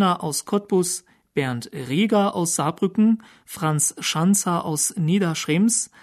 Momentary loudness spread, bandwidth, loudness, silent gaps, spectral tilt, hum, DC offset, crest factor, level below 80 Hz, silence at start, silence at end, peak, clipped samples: 8 LU; 13.5 kHz; -22 LUFS; none; -4.5 dB/octave; none; under 0.1%; 14 dB; -66 dBFS; 0 s; 0.15 s; -8 dBFS; under 0.1%